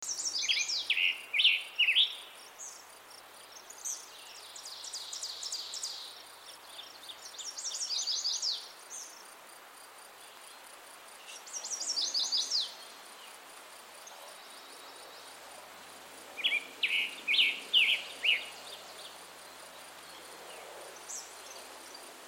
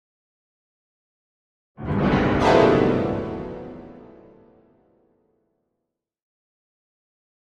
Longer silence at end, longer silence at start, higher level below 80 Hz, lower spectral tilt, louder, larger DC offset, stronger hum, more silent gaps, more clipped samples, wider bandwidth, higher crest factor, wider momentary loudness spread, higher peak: second, 0 s vs 3.6 s; second, 0 s vs 1.8 s; second, under -90 dBFS vs -44 dBFS; second, 3 dB/octave vs -7.5 dB/octave; second, -30 LUFS vs -20 LUFS; neither; neither; neither; neither; first, 16 kHz vs 10.5 kHz; about the same, 22 dB vs 22 dB; about the same, 23 LU vs 21 LU; second, -14 dBFS vs -4 dBFS